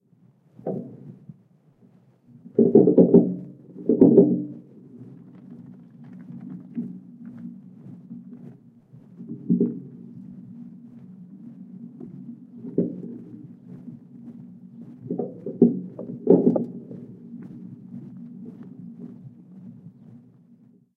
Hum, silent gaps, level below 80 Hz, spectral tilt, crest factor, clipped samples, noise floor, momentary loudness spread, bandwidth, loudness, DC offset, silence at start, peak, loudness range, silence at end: none; none; -68 dBFS; -14 dB/octave; 24 dB; under 0.1%; -58 dBFS; 27 LU; 2.1 kHz; -21 LUFS; under 0.1%; 0.65 s; -2 dBFS; 21 LU; 1.1 s